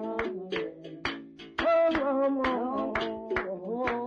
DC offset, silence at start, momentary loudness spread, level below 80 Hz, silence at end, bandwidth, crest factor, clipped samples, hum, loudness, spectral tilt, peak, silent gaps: under 0.1%; 0 s; 11 LU; -54 dBFS; 0 s; 7.2 kHz; 12 dB; under 0.1%; none; -30 LUFS; -6 dB/octave; -18 dBFS; none